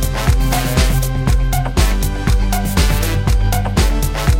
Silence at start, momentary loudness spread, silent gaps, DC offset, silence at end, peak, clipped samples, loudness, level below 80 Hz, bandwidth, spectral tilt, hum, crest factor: 0 s; 2 LU; none; under 0.1%; 0 s; 0 dBFS; under 0.1%; -16 LUFS; -16 dBFS; 16.5 kHz; -5 dB/octave; none; 14 dB